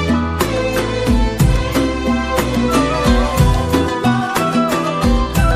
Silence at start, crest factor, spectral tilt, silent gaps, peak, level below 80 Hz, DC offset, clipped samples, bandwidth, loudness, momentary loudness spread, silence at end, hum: 0 s; 12 dB; -6 dB/octave; none; -2 dBFS; -20 dBFS; under 0.1%; under 0.1%; 16 kHz; -16 LUFS; 3 LU; 0 s; none